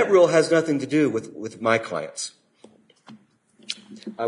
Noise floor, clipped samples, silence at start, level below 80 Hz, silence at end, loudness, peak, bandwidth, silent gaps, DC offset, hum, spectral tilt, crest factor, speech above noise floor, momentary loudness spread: -57 dBFS; under 0.1%; 0 s; -70 dBFS; 0 s; -22 LUFS; -4 dBFS; 11 kHz; none; under 0.1%; none; -5 dB/octave; 18 dB; 35 dB; 18 LU